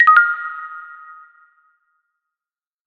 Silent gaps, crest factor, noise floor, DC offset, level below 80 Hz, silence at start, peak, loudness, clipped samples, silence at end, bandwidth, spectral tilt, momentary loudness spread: none; 20 dB; under -90 dBFS; under 0.1%; -84 dBFS; 0 s; 0 dBFS; -15 LUFS; under 0.1%; 2 s; 4.9 kHz; 0 dB/octave; 26 LU